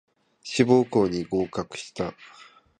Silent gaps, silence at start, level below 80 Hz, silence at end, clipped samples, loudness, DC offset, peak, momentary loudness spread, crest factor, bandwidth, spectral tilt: none; 0.45 s; -56 dBFS; 0.55 s; under 0.1%; -25 LUFS; under 0.1%; -4 dBFS; 13 LU; 22 dB; 9.8 kHz; -6 dB/octave